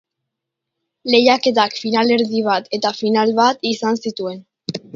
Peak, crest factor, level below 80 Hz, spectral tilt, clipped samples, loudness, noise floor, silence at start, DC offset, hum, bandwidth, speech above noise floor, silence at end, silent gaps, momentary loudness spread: 0 dBFS; 18 dB; -66 dBFS; -4.5 dB/octave; under 0.1%; -17 LUFS; -81 dBFS; 1.05 s; under 0.1%; none; 7.6 kHz; 64 dB; 0.15 s; none; 14 LU